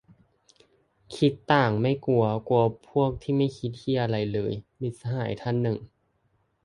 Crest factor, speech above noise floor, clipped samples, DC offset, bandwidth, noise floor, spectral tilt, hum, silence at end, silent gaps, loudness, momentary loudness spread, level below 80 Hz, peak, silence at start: 20 dB; 45 dB; under 0.1%; under 0.1%; 11 kHz; -70 dBFS; -8 dB/octave; none; 0.8 s; none; -26 LUFS; 11 LU; -56 dBFS; -6 dBFS; 1.1 s